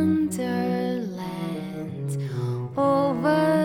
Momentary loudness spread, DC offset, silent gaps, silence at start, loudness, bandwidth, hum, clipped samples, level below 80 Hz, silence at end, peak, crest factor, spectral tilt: 10 LU; under 0.1%; none; 0 s; -26 LUFS; 17.5 kHz; none; under 0.1%; -62 dBFS; 0 s; -10 dBFS; 14 dB; -7 dB/octave